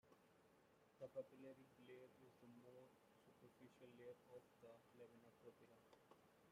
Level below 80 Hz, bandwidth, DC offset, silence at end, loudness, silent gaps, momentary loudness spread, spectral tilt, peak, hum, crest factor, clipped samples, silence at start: under -90 dBFS; 15 kHz; under 0.1%; 0 s; -64 LUFS; none; 11 LU; -6 dB/octave; -42 dBFS; none; 24 dB; under 0.1%; 0.05 s